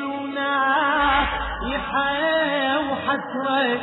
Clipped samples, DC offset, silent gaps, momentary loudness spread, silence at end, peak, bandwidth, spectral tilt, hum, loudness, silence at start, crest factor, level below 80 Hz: under 0.1%; under 0.1%; none; 7 LU; 0 s; -8 dBFS; 4.1 kHz; -7.5 dB/octave; none; -22 LUFS; 0 s; 14 dB; -40 dBFS